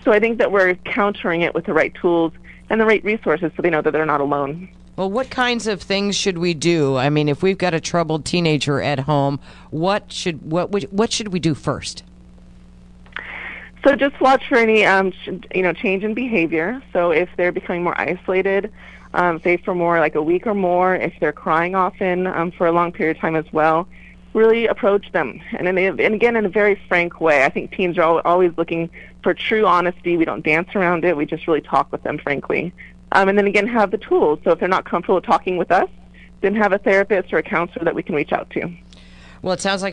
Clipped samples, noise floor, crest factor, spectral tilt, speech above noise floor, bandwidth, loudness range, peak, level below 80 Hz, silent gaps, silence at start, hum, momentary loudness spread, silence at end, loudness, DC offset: under 0.1%; -43 dBFS; 18 dB; -5.5 dB/octave; 25 dB; 10.5 kHz; 3 LU; 0 dBFS; -48 dBFS; none; 0 s; none; 9 LU; 0 s; -18 LUFS; under 0.1%